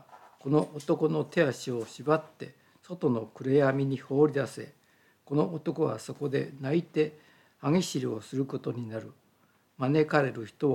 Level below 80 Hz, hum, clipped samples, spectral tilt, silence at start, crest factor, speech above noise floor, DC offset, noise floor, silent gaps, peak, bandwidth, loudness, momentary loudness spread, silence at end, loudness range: -80 dBFS; none; under 0.1%; -6.5 dB/octave; 0.1 s; 20 dB; 38 dB; under 0.1%; -67 dBFS; none; -10 dBFS; 14 kHz; -29 LUFS; 12 LU; 0 s; 3 LU